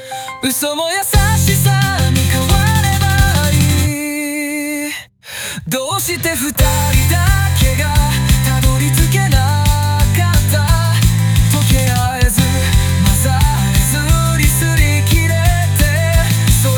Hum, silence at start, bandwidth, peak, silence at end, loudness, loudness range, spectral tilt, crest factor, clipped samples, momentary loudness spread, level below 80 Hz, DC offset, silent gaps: none; 0 s; over 20 kHz; 0 dBFS; 0 s; -13 LUFS; 3 LU; -4.5 dB/octave; 12 dB; under 0.1%; 7 LU; -20 dBFS; under 0.1%; none